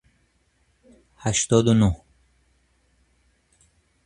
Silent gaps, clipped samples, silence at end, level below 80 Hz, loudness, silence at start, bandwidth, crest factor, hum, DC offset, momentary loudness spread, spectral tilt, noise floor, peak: none; under 0.1%; 2.1 s; -44 dBFS; -21 LUFS; 1.25 s; 11 kHz; 22 dB; none; under 0.1%; 13 LU; -5 dB/octave; -66 dBFS; -4 dBFS